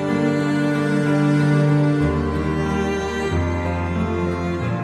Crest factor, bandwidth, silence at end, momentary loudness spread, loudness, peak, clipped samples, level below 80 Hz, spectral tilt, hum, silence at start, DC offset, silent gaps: 12 dB; 11 kHz; 0 s; 6 LU; -20 LUFS; -6 dBFS; under 0.1%; -36 dBFS; -7.5 dB/octave; none; 0 s; under 0.1%; none